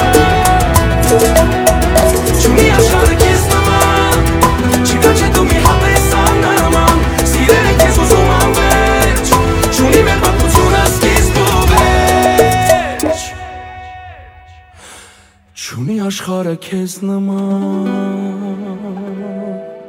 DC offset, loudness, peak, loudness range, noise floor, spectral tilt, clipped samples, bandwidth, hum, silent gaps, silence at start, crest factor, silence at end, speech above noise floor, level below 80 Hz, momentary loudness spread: under 0.1%; -11 LUFS; 0 dBFS; 10 LU; -44 dBFS; -4.5 dB/octave; 0.6%; over 20 kHz; none; none; 0 s; 12 dB; 0 s; 26 dB; -18 dBFS; 14 LU